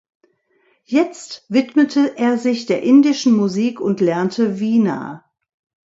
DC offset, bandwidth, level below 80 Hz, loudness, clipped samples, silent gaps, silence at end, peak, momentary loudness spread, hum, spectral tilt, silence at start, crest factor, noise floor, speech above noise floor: under 0.1%; 7.8 kHz; -66 dBFS; -17 LUFS; under 0.1%; none; 0.7 s; -2 dBFS; 8 LU; none; -6 dB/octave; 0.9 s; 16 dB; -61 dBFS; 45 dB